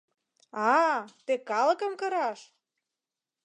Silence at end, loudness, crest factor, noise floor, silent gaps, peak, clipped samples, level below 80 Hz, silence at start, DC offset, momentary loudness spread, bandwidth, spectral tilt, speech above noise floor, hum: 1 s; -28 LUFS; 18 dB; -90 dBFS; none; -12 dBFS; under 0.1%; under -90 dBFS; 0.55 s; under 0.1%; 10 LU; 10 kHz; -3.5 dB/octave; 62 dB; none